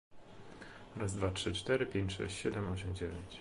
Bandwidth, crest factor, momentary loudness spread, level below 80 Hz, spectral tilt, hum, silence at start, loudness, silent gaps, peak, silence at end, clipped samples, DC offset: 11.5 kHz; 20 dB; 18 LU; -52 dBFS; -5 dB/octave; none; 0.1 s; -38 LUFS; none; -20 dBFS; 0 s; under 0.1%; under 0.1%